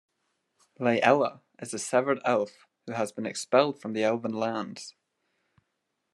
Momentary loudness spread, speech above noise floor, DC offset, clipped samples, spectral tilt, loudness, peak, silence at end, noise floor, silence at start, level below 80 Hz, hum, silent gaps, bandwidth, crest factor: 15 LU; 53 dB; under 0.1%; under 0.1%; -4.5 dB/octave; -28 LUFS; -6 dBFS; 1.25 s; -80 dBFS; 0.8 s; -82 dBFS; none; none; 12.5 kHz; 24 dB